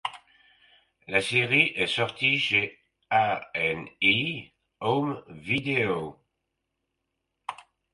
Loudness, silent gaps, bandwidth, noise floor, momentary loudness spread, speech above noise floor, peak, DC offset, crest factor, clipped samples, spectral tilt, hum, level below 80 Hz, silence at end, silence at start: -25 LUFS; none; 11.5 kHz; -81 dBFS; 16 LU; 55 dB; -6 dBFS; under 0.1%; 22 dB; under 0.1%; -4.5 dB/octave; none; -64 dBFS; 0.3 s; 0.05 s